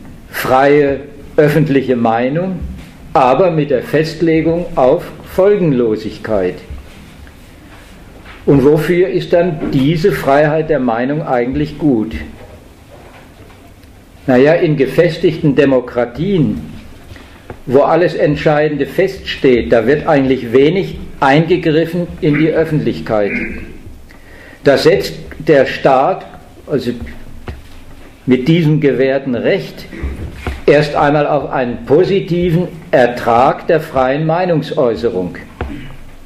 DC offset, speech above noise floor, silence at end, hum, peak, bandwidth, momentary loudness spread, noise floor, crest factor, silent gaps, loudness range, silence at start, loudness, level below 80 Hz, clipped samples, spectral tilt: under 0.1%; 27 dB; 0 s; none; 0 dBFS; 15 kHz; 14 LU; -39 dBFS; 14 dB; none; 4 LU; 0 s; -13 LUFS; -34 dBFS; under 0.1%; -7.5 dB/octave